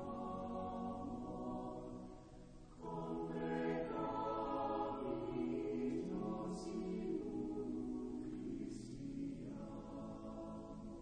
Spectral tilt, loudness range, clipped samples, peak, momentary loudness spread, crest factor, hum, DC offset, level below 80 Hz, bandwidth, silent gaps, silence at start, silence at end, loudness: -7.5 dB/octave; 5 LU; under 0.1%; -30 dBFS; 9 LU; 14 dB; none; under 0.1%; -60 dBFS; 9.4 kHz; none; 0 s; 0 s; -45 LUFS